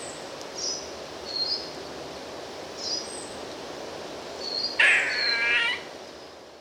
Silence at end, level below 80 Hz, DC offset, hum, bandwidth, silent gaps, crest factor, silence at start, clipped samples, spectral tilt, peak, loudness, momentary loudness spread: 0 s; -62 dBFS; under 0.1%; none; 18 kHz; none; 22 dB; 0 s; under 0.1%; -0.5 dB/octave; -8 dBFS; -26 LUFS; 18 LU